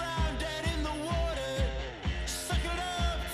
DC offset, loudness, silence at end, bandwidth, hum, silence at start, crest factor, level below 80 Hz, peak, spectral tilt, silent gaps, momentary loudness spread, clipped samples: under 0.1%; -33 LUFS; 0 s; 14.5 kHz; none; 0 s; 14 dB; -36 dBFS; -18 dBFS; -4.5 dB/octave; none; 3 LU; under 0.1%